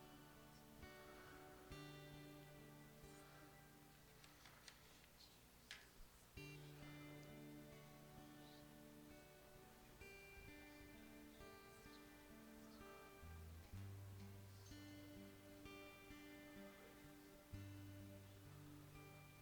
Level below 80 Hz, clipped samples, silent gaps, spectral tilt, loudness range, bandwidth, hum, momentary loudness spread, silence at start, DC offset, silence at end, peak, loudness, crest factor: -72 dBFS; under 0.1%; none; -5 dB/octave; 3 LU; 19 kHz; 60 Hz at -75 dBFS; 7 LU; 0 s; under 0.1%; 0 s; -38 dBFS; -61 LUFS; 22 dB